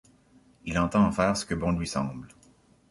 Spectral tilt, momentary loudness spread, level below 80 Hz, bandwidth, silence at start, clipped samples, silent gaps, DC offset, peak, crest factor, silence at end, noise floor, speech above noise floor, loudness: -5.5 dB/octave; 13 LU; -46 dBFS; 11.5 kHz; 0.65 s; under 0.1%; none; under 0.1%; -10 dBFS; 20 dB; 0.65 s; -60 dBFS; 34 dB; -27 LUFS